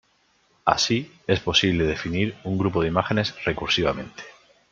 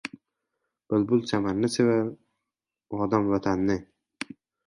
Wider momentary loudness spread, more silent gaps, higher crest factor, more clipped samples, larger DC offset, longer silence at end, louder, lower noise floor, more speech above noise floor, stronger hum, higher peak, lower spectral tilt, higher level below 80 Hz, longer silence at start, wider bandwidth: second, 8 LU vs 16 LU; neither; about the same, 22 dB vs 20 dB; neither; neither; second, 0.4 s vs 0.85 s; first, -23 LUFS vs -26 LUFS; second, -64 dBFS vs -87 dBFS; second, 41 dB vs 63 dB; neither; first, -2 dBFS vs -8 dBFS; second, -4.5 dB/octave vs -6.5 dB/octave; first, -48 dBFS vs -56 dBFS; first, 0.65 s vs 0.05 s; second, 7.6 kHz vs 11.5 kHz